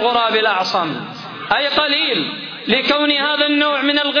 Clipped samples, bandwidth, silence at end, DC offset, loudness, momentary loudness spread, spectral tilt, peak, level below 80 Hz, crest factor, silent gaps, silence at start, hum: under 0.1%; 5.4 kHz; 0 s; under 0.1%; -16 LUFS; 10 LU; -4 dB/octave; -2 dBFS; -58 dBFS; 14 dB; none; 0 s; none